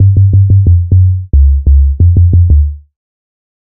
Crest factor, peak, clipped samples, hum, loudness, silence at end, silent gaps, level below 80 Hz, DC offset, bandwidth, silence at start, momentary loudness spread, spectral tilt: 8 dB; 0 dBFS; 0.1%; none; -8 LUFS; 0.85 s; none; -12 dBFS; under 0.1%; 0.7 kHz; 0 s; 3 LU; -20 dB/octave